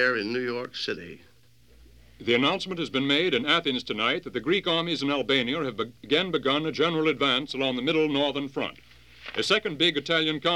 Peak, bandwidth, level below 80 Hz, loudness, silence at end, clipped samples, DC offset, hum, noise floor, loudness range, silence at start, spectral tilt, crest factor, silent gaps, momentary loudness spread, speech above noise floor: -8 dBFS; 14.5 kHz; -60 dBFS; -25 LUFS; 0 s; under 0.1%; 0.1%; none; -59 dBFS; 2 LU; 0 s; -4.5 dB/octave; 20 dB; none; 9 LU; 32 dB